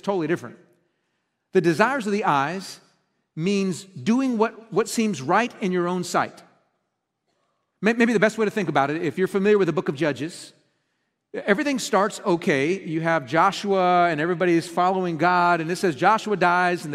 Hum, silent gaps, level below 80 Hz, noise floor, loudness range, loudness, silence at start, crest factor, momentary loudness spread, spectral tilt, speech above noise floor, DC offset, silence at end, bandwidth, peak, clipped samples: none; none; -70 dBFS; -77 dBFS; 4 LU; -22 LUFS; 0.05 s; 22 dB; 9 LU; -5.5 dB/octave; 55 dB; under 0.1%; 0 s; 15 kHz; -2 dBFS; under 0.1%